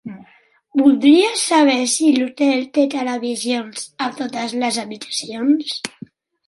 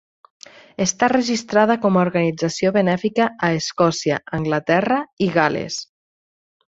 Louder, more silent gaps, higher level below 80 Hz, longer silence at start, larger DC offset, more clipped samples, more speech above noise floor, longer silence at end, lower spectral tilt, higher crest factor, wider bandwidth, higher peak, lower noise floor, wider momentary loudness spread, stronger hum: about the same, -17 LUFS vs -19 LUFS; second, none vs 5.13-5.17 s; second, -68 dBFS vs -56 dBFS; second, 0.05 s vs 0.8 s; neither; neither; second, 37 dB vs over 71 dB; second, 0.6 s vs 0.85 s; second, -2.5 dB/octave vs -5 dB/octave; about the same, 16 dB vs 18 dB; first, 11.5 kHz vs 8 kHz; about the same, -2 dBFS vs -2 dBFS; second, -54 dBFS vs under -90 dBFS; first, 12 LU vs 5 LU; neither